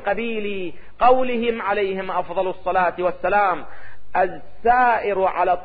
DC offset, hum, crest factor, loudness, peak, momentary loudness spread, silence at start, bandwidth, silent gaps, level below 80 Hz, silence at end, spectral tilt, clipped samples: under 0.1%; none; 16 dB; -21 LUFS; -4 dBFS; 9 LU; 0 s; 4.9 kHz; none; -48 dBFS; 0 s; -9.5 dB/octave; under 0.1%